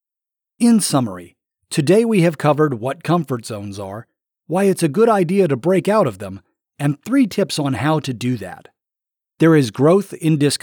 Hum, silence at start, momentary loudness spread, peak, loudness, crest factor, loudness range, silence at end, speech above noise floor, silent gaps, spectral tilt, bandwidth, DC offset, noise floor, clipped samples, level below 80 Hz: none; 0.6 s; 14 LU; -4 dBFS; -17 LUFS; 14 dB; 2 LU; 0.05 s; 70 dB; none; -6 dB/octave; 19.5 kHz; under 0.1%; -87 dBFS; under 0.1%; -64 dBFS